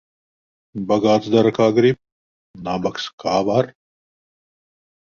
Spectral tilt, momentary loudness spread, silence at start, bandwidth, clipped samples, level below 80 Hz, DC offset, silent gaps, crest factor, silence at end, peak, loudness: -6.5 dB/octave; 14 LU; 0.75 s; 7.2 kHz; under 0.1%; -56 dBFS; under 0.1%; 2.12-2.54 s, 3.13-3.18 s; 18 dB; 1.35 s; -2 dBFS; -19 LUFS